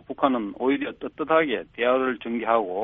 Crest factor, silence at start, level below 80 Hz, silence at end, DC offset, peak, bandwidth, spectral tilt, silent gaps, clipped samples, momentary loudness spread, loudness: 18 dB; 0.1 s; -60 dBFS; 0 s; under 0.1%; -6 dBFS; 3.9 kHz; -3 dB/octave; none; under 0.1%; 6 LU; -24 LUFS